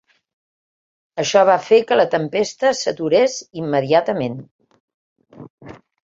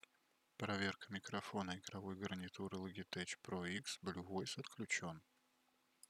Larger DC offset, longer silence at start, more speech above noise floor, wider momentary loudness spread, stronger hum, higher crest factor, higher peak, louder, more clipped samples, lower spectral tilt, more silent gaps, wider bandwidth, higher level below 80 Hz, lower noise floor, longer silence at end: neither; first, 1.15 s vs 0.6 s; first, over 73 dB vs 33 dB; first, 12 LU vs 7 LU; neither; about the same, 18 dB vs 22 dB; first, -2 dBFS vs -26 dBFS; first, -17 LUFS vs -46 LUFS; neither; about the same, -4.5 dB/octave vs -4 dB/octave; first, 4.51-4.59 s, 4.80-4.88 s, 4.94-5.16 s, 5.50-5.58 s vs none; second, 7.8 kHz vs 15 kHz; first, -62 dBFS vs -80 dBFS; first, under -90 dBFS vs -80 dBFS; second, 0.4 s vs 0.9 s